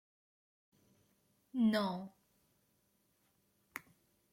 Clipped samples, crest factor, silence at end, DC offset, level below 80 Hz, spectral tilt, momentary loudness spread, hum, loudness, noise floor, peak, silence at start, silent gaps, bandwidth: under 0.1%; 20 dB; 0.55 s; under 0.1%; -82 dBFS; -6.5 dB/octave; 18 LU; none; -36 LUFS; -77 dBFS; -22 dBFS; 1.55 s; none; 16 kHz